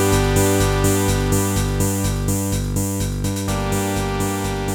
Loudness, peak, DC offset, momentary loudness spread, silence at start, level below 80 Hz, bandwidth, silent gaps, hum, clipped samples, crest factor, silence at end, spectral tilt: -20 LUFS; -4 dBFS; under 0.1%; 6 LU; 0 s; -28 dBFS; over 20 kHz; none; 50 Hz at -30 dBFS; under 0.1%; 14 dB; 0 s; -5 dB/octave